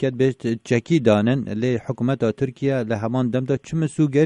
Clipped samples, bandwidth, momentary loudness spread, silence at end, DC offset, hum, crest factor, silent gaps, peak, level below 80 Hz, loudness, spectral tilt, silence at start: under 0.1%; 10.5 kHz; 6 LU; 0 s; under 0.1%; none; 16 dB; none; -4 dBFS; -56 dBFS; -22 LUFS; -7.5 dB/octave; 0 s